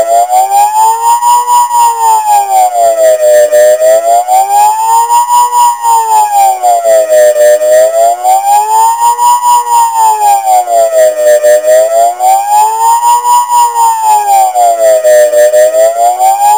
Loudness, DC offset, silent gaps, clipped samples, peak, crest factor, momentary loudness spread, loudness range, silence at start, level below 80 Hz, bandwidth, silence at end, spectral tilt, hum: -6 LUFS; 0.4%; none; under 0.1%; 0 dBFS; 6 dB; 3 LU; 1 LU; 0 s; -58 dBFS; 17.5 kHz; 0 s; 0.5 dB/octave; none